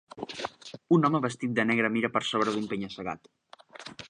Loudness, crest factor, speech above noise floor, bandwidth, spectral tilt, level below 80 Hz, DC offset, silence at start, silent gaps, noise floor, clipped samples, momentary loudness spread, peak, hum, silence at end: -28 LUFS; 20 dB; 20 dB; 10.5 kHz; -5.5 dB/octave; -68 dBFS; under 0.1%; 0.15 s; none; -47 dBFS; under 0.1%; 18 LU; -10 dBFS; none; 0 s